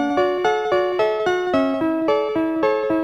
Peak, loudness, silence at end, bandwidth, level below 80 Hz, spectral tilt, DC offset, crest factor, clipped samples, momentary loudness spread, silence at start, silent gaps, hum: -6 dBFS; -20 LUFS; 0 s; 8.4 kHz; -56 dBFS; -5.5 dB/octave; 0.1%; 14 dB; under 0.1%; 2 LU; 0 s; none; none